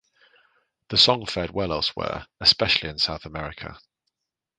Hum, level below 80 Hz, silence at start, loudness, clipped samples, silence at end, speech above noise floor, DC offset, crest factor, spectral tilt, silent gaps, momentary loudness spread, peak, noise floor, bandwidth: none; -48 dBFS; 0.9 s; -21 LUFS; under 0.1%; 0.8 s; 59 dB; under 0.1%; 24 dB; -3.5 dB/octave; none; 17 LU; -2 dBFS; -84 dBFS; 9.6 kHz